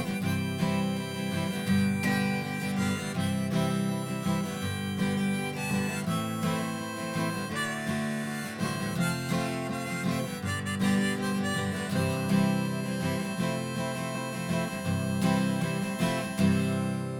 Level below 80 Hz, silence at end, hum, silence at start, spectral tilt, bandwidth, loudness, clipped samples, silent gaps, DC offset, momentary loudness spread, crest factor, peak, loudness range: -64 dBFS; 0 s; none; 0 s; -5.5 dB/octave; 17.5 kHz; -30 LUFS; under 0.1%; none; under 0.1%; 6 LU; 16 dB; -14 dBFS; 2 LU